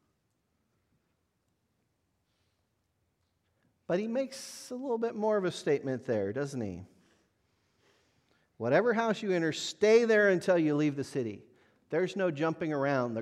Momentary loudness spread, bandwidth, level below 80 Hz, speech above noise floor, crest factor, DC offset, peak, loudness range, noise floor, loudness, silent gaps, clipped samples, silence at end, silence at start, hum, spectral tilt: 14 LU; 13 kHz; -78 dBFS; 48 dB; 20 dB; under 0.1%; -12 dBFS; 11 LU; -78 dBFS; -30 LUFS; none; under 0.1%; 0 s; 3.9 s; none; -5.5 dB/octave